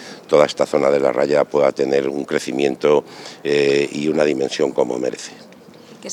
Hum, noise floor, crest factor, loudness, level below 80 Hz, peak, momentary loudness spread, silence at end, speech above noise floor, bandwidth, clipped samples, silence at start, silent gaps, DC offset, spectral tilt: none; -43 dBFS; 18 dB; -18 LUFS; -60 dBFS; 0 dBFS; 9 LU; 0 s; 25 dB; 12.5 kHz; under 0.1%; 0 s; none; under 0.1%; -4.5 dB/octave